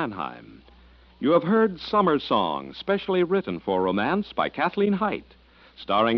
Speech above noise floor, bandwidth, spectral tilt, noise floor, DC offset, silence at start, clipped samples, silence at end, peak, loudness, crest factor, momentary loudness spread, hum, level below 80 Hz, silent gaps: 29 dB; 6 kHz; -4 dB/octave; -53 dBFS; under 0.1%; 0 s; under 0.1%; 0 s; -8 dBFS; -24 LUFS; 16 dB; 9 LU; none; -56 dBFS; none